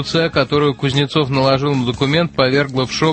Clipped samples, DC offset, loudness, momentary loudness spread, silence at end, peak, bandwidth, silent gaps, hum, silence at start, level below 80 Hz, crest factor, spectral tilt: under 0.1%; under 0.1%; -16 LUFS; 2 LU; 0 s; -2 dBFS; 8.8 kHz; none; none; 0 s; -44 dBFS; 14 dB; -6 dB/octave